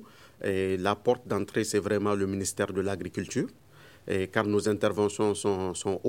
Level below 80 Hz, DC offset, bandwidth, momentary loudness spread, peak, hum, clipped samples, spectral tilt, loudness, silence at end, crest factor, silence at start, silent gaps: -64 dBFS; under 0.1%; 16.5 kHz; 6 LU; -8 dBFS; none; under 0.1%; -5 dB/octave; -29 LUFS; 0 s; 22 dB; 0 s; none